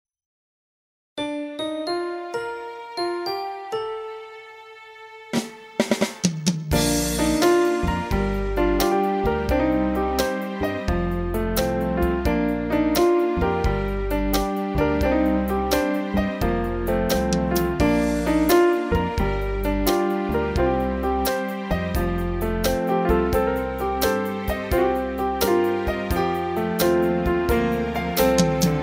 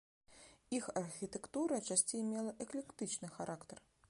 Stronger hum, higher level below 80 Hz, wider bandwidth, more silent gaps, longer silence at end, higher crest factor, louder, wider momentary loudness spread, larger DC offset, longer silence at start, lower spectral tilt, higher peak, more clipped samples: neither; first, -32 dBFS vs -76 dBFS; first, 16 kHz vs 11.5 kHz; neither; second, 0 s vs 0.3 s; about the same, 18 dB vs 22 dB; first, -23 LUFS vs -41 LUFS; second, 9 LU vs 14 LU; neither; first, 1.15 s vs 0.3 s; first, -5.5 dB/octave vs -3.5 dB/octave; first, -4 dBFS vs -20 dBFS; neither